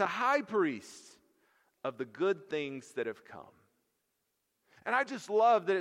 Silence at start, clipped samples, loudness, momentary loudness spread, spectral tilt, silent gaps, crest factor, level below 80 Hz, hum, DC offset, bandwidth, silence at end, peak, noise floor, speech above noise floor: 0 s; under 0.1%; -32 LUFS; 22 LU; -4.5 dB/octave; none; 18 dB; -86 dBFS; none; under 0.1%; 13.5 kHz; 0 s; -16 dBFS; -82 dBFS; 50 dB